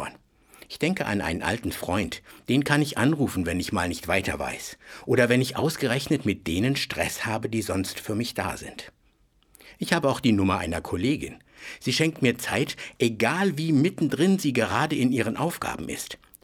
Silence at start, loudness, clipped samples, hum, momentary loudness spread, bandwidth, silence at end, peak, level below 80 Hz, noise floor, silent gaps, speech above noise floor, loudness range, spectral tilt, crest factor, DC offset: 0 s; -25 LUFS; under 0.1%; none; 11 LU; 19 kHz; 0.3 s; -4 dBFS; -52 dBFS; -63 dBFS; none; 38 dB; 4 LU; -5 dB/octave; 22 dB; under 0.1%